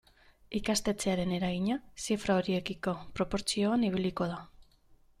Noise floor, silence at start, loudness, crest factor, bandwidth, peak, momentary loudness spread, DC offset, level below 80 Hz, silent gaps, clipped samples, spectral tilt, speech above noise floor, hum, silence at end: -62 dBFS; 0.5 s; -32 LUFS; 18 dB; 14.5 kHz; -14 dBFS; 7 LU; under 0.1%; -54 dBFS; none; under 0.1%; -5 dB/octave; 31 dB; none; 0.55 s